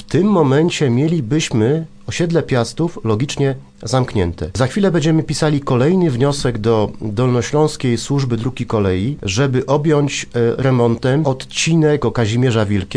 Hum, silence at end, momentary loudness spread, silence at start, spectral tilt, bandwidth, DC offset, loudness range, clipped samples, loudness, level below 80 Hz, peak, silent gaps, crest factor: none; 0 s; 6 LU; 0 s; -6 dB/octave; 10.5 kHz; under 0.1%; 2 LU; under 0.1%; -16 LUFS; -40 dBFS; 0 dBFS; none; 14 dB